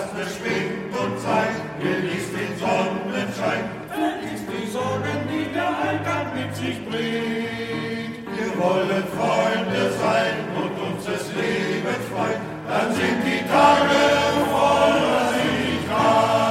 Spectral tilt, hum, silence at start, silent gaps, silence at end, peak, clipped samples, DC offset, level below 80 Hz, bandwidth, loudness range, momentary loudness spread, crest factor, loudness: -5 dB/octave; none; 0 s; none; 0 s; -2 dBFS; under 0.1%; under 0.1%; -54 dBFS; 16 kHz; 7 LU; 10 LU; 20 dB; -22 LUFS